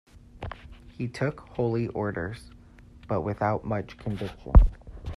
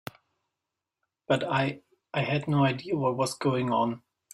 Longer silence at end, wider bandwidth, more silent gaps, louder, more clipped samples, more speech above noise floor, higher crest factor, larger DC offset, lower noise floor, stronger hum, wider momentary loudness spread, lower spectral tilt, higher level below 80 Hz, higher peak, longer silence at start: second, 0 s vs 0.35 s; second, 10.5 kHz vs 15 kHz; neither; about the same, -28 LUFS vs -28 LUFS; neither; second, 25 dB vs 60 dB; first, 24 dB vs 16 dB; neither; second, -50 dBFS vs -87 dBFS; neither; first, 20 LU vs 9 LU; first, -8.5 dB/octave vs -6 dB/octave; first, -28 dBFS vs -66 dBFS; first, -2 dBFS vs -12 dBFS; second, 0.35 s vs 1.3 s